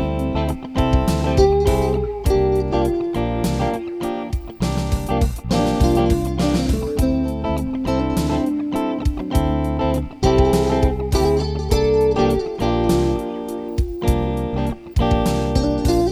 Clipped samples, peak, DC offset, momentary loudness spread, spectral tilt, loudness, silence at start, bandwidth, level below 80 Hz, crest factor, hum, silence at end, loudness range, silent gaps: under 0.1%; -2 dBFS; under 0.1%; 7 LU; -7 dB/octave; -20 LUFS; 0 s; 15.5 kHz; -26 dBFS; 16 dB; none; 0 s; 3 LU; none